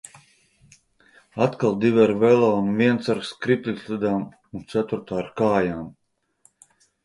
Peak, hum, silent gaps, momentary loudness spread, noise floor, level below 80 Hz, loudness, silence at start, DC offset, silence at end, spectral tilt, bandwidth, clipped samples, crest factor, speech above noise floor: -4 dBFS; none; none; 13 LU; -62 dBFS; -58 dBFS; -22 LUFS; 1.35 s; under 0.1%; 1.15 s; -7 dB/octave; 11.5 kHz; under 0.1%; 18 dB; 41 dB